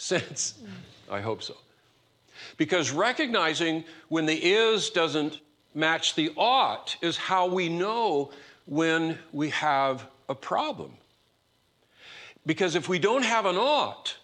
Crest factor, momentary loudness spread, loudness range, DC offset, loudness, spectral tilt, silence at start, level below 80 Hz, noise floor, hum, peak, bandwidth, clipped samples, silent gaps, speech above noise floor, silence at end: 18 dB; 15 LU; 6 LU; under 0.1%; -26 LUFS; -3.5 dB/octave; 0 s; -76 dBFS; -69 dBFS; none; -10 dBFS; 10.5 kHz; under 0.1%; none; 42 dB; 0.05 s